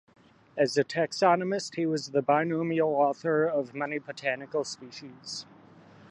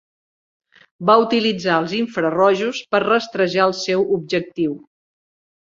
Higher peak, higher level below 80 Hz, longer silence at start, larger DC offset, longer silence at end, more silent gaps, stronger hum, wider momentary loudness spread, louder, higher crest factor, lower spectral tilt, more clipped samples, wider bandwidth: second, -8 dBFS vs -2 dBFS; second, -78 dBFS vs -64 dBFS; second, 0.55 s vs 1 s; neither; about the same, 0.7 s vs 0.8 s; neither; neither; first, 14 LU vs 8 LU; second, -28 LUFS vs -18 LUFS; about the same, 20 dB vs 18 dB; about the same, -5 dB/octave vs -5 dB/octave; neither; first, 11 kHz vs 7.6 kHz